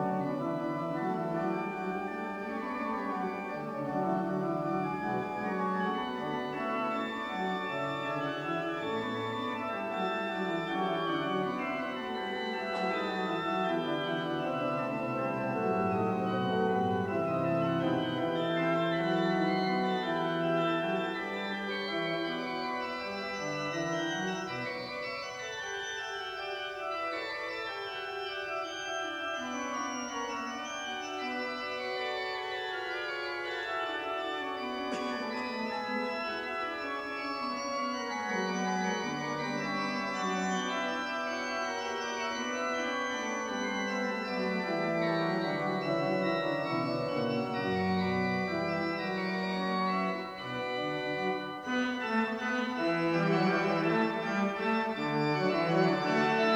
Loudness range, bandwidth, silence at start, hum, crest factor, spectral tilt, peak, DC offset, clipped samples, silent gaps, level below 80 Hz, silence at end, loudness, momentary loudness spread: 5 LU; 19 kHz; 0 s; none; 18 dB; -5 dB/octave; -14 dBFS; under 0.1%; under 0.1%; none; -68 dBFS; 0 s; -33 LUFS; 6 LU